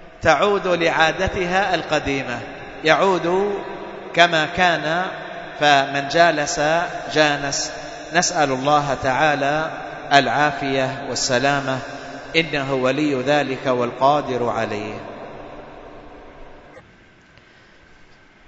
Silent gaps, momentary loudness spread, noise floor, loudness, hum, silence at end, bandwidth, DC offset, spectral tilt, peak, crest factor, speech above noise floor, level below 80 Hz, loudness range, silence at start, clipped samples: none; 15 LU; -49 dBFS; -19 LUFS; none; 1.65 s; 8 kHz; under 0.1%; -3.5 dB/octave; 0 dBFS; 20 dB; 31 dB; -48 dBFS; 5 LU; 0 s; under 0.1%